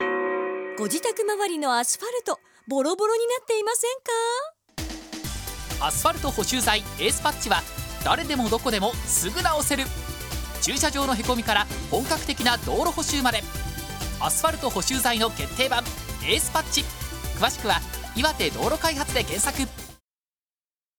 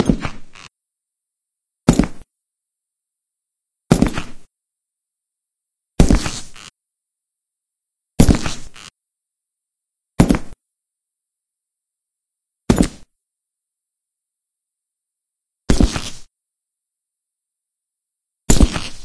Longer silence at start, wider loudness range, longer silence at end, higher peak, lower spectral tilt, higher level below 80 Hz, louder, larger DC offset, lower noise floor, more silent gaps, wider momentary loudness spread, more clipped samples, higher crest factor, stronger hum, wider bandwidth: about the same, 0 s vs 0 s; second, 2 LU vs 5 LU; first, 1.05 s vs 0 s; second, -4 dBFS vs 0 dBFS; second, -2.5 dB/octave vs -5.5 dB/octave; second, -38 dBFS vs -26 dBFS; second, -25 LUFS vs -18 LUFS; neither; first, under -90 dBFS vs -84 dBFS; neither; second, 10 LU vs 19 LU; neither; about the same, 22 dB vs 22 dB; neither; first, over 20 kHz vs 11 kHz